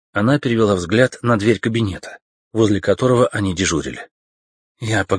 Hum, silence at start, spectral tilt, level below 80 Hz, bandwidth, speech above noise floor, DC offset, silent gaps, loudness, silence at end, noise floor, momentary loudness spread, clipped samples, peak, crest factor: none; 0.15 s; -5.5 dB/octave; -46 dBFS; 10.5 kHz; over 73 dB; under 0.1%; 2.22-2.51 s, 4.11-4.75 s; -18 LUFS; 0 s; under -90 dBFS; 14 LU; under 0.1%; 0 dBFS; 18 dB